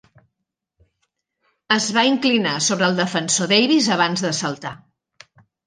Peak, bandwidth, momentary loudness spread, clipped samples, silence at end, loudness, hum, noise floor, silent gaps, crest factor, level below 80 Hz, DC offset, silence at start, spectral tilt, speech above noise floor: -2 dBFS; 10.5 kHz; 8 LU; under 0.1%; 0.9 s; -18 LUFS; none; -80 dBFS; none; 20 dB; -66 dBFS; under 0.1%; 1.7 s; -3 dB/octave; 61 dB